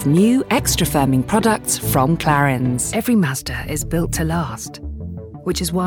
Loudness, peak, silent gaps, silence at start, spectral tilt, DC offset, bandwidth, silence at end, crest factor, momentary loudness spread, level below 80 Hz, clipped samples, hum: -18 LUFS; -4 dBFS; none; 0 s; -5 dB/octave; under 0.1%; over 20 kHz; 0 s; 14 dB; 13 LU; -34 dBFS; under 0.1%; none